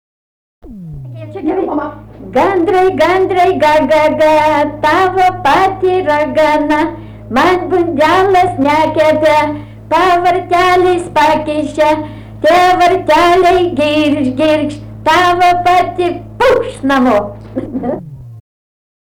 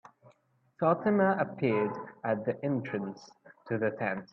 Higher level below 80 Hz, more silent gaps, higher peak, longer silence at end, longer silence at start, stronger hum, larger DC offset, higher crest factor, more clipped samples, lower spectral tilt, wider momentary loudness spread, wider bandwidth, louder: first, -38 dBFS vs -74 dBFS; neither; first, -4 dBFS vs -12 dBFS; first, 0.65 s vs 0.1 s; second, 0.65 s vs 0.8 s; neither; neither; second, 8 dB vs 20 dB; neither; second, -5.5 dB/octave vs -8.5 dB/octave; about the same, 11 LU vs 11 LU; first, 20 kHz vs 6.4 kHz; first, -11 LUFS vs -31 LUFS